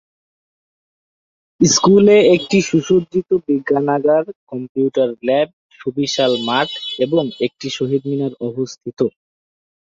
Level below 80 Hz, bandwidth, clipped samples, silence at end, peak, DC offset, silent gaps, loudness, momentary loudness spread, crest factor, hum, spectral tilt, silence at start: -56 dBFS; 7.6 kHz; under 0.1%; 0.9 s; -2 dBFS; under 0.1%; 4.35-4.47 s, 4.69-4.75 s, 5.53-5.70 s; -16 LUFS; 13 LU; 16 dB; none; -4.5 dB/octave; 1.6 s